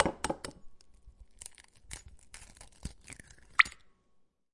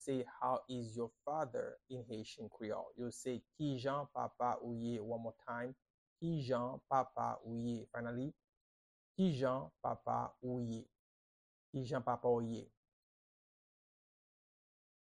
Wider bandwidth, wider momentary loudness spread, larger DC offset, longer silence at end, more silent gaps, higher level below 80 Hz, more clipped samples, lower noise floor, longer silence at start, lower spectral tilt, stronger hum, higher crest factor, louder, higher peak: first, 11.5 kHz vs 10 kHz; first, 26 LU vs 10 LU; neither; second, 0.85 s vs 2.35 s; second, none vs 5.90-6.16 s, 8.44-8.48 s, 8.57-9.15 s, 10.99-11.73 s; first, -56 dBFS vs -74 dBFS; neither; second, -70 dBFS vs under -90 dBFS; about the same, 0 s vs 0 s; second, -2.5 dB/octave vs -7 dB/octave; neither; first, 32 dB vs 22 dB; first, -30 LUFS vs -42 LUFS; first, -4 dBFS vs -22 dBFS